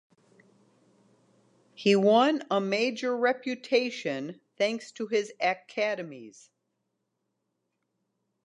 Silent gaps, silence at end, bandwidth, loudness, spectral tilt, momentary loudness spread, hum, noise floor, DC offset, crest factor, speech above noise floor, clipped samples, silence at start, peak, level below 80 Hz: none; 2.15 s; 10.5 kHz; -27 LUFS; -5 dB/octave; 14 LU; none; -80 dBFS; under 0.1%; 20 dB; 53 dB; under 0.1%; 1.8 s; -10 dBFS; -86 dBFS